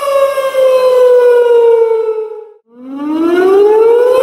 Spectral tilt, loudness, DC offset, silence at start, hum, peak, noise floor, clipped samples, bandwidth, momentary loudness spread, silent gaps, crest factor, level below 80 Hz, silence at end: -4 dB/octave; -9 LUFS; under 0.1%; 0 s; none; 0 dBFS; -33 dBFS; under 0.1%; 14.5 kHz; 12 LU; none; 8 dB; -62 dBFS; 0 s